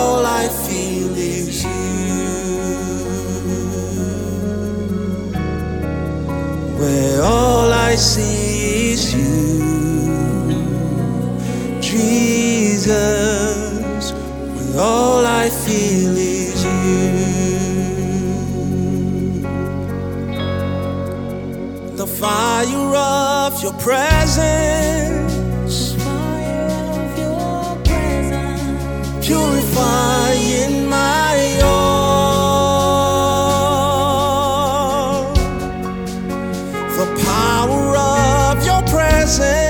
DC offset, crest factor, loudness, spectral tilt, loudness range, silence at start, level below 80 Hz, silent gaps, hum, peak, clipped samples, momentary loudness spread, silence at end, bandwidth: under 0.1%; 16 dB; -17 LUFS; -5 dB/octave; 7 LU; 0 s; -28 dBFS; none; none; 0 dBFS; under 0.1%; 8 LU; 0 s; 19.5 kHz